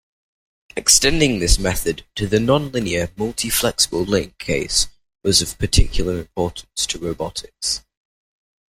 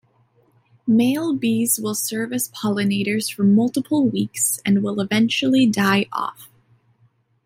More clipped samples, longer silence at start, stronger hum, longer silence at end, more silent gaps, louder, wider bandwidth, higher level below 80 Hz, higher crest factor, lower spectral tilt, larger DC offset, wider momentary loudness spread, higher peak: neither; about the same, 0.75 s vs 0.85 s; neither; about the same, 0.9 s vs 1 s; neither; about the same, -19 LUFS vs -20 LUFS; about the same, 16.5 kHz vs 16.5 kHz; first, -28 dBFS vs -64 dBFS; first, 20 dB vs 14 dB; about the same, -3 dB/octave vs -4 dB/octave; neither; first, 10 LU vs 7 LU; first, 0 dBFS vs -6 dBFS